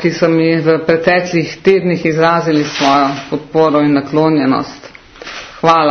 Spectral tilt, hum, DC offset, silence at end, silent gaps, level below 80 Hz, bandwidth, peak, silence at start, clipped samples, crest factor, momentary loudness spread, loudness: -6 dB/octave; none; under 0.1%; 0 s; none; -48 dBFS; 6.6 kHz; 0 dBFS; 0 s; under 0.1%; 12 dB; 9 LU; -12 LUFS